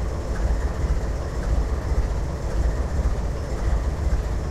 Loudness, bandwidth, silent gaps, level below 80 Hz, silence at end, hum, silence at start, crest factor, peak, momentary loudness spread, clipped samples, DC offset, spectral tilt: -26 LUFS; 9.8 kHz; none; -24 dBFS; 0 s; none; 0 s; 12 dB; -10 dBFS; 3 LU; under 0.1%; under 0.1%; -7 dB/octave